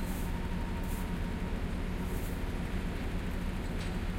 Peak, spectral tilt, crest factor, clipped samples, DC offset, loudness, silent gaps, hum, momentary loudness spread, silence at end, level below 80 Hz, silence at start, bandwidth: -22 dBFS; -6 dB/octave; 12 dB; under 0.1%; under 0.1%; -37 LUFS; none; none; 1 LU; 0 s; -36 dBFS; 0 s; 16 kHz